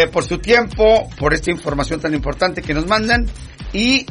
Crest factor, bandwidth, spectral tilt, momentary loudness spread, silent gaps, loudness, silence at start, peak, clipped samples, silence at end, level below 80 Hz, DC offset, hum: 14 dB; 11 kHz; -4.5 dB/octave; 8 LU; none; -17 LUFS; 0 s; -2 dBFS; under 0.1%; 0.05 s; -28 dBFS; under 0.1%; none